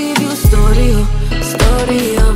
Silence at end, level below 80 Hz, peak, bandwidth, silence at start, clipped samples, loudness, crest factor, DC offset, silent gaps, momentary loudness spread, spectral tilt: 0 s; -12 dBFS; 0 dBFS; 16.5 kHz; 0 s; under 0.1%; -13 LUFS; 10 dB; under 0.1%; none; 6 LU; -5.5 dB/octave